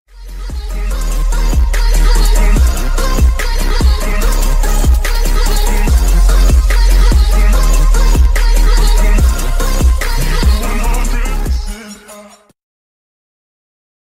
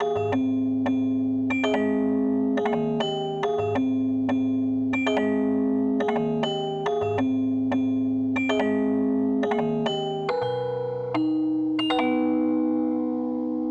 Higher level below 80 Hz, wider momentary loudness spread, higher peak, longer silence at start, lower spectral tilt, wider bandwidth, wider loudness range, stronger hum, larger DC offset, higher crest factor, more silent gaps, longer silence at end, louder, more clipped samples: first, -10 dBFS vs -60 dBFS; first, 9 LU vs 4 LU; first, 0 dBFS vs -12 dBFS; first, 0.15 s vs 0 s; second, -4.5 dB/octave vs -7 dB/octave; first, 16 kHz vs 7.8 kHz; first, 6 LU vs 1 LU; neither; neither; about the same, 10 dB vs 12 dB; neither; first, 1.8 s vs 0 s; first, -14 LUFS vs -25 LUFS; neither